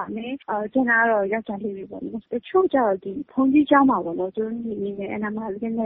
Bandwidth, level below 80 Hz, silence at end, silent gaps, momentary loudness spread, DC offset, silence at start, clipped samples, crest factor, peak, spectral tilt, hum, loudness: 3.9 kHz; -60 dBFS; 0 s; none; 13 LU; under 0.1%; 0 s; under 0.1%; 18 dB; -4 dBFS; -4.5 dB/octave; none; -23 LUFS